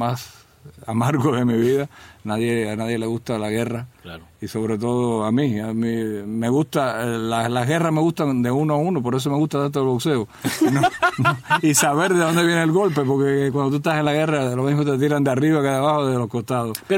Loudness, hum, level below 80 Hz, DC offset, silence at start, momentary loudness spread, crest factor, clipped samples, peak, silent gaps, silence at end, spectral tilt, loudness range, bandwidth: -20 LUFS; none; -58 dBFS; under 0.1%; 0 s; 8 LU; 18 dB; under 0.1%; -2 dBFS; none; 0 s; -5.5 dB/octave; 5 LU; 16.5 kHz